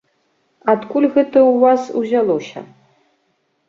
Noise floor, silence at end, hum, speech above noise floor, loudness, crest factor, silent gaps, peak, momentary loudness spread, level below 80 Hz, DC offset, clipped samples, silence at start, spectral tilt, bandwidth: -65 dBFS; 1.05 s; none; 51 dB; -15 LUFS; 16 dB; none; -2 dBFS; 12 LU; -64 dBFS; under 0.1%; under 0.1%; 0.65 s; -6.5 dB/octave; 7.2 kHz